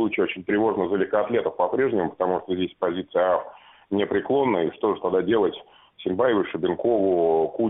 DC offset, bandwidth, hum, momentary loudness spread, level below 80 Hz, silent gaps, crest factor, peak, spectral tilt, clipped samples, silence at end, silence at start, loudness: under 0.1%; 3.9 kHz; none; 6 LU; -62 dBFS; none; 16 dB; -8 dBFS; -4.5 dB/octave; under 0.1%; 0 s; 0 s; -23 LUFS